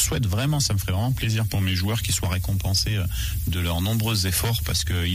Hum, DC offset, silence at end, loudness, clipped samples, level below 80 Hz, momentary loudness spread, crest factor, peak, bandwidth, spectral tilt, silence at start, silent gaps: none; under 0.1%; 0 s; -23 LUFS; under 0.1%; -34 dBFS; 3 LU; 14 dB; -10 dBFS; 16 kHz; -4 dB/octave; 0 s; none